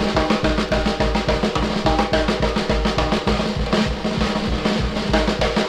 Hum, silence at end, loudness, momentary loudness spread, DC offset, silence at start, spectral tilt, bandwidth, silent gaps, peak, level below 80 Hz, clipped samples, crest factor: none; 0 s; -20 LUFS; 2 LU; under 0.1%; 0 s; -5.5 dB/octave; 12 kHz; none; -4 dBFS; -28 dBFS; under 0.1%; 16 dB